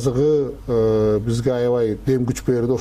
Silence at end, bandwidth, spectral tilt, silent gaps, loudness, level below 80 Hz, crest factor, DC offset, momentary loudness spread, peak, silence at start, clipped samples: 0 s; 15 kHz; -7.5 dB/octave; none; -20 LUFS; -40 dBFS; 10 dB; under 0.1%; 3 LU; -8 dBFS; 0 s; under 0.1%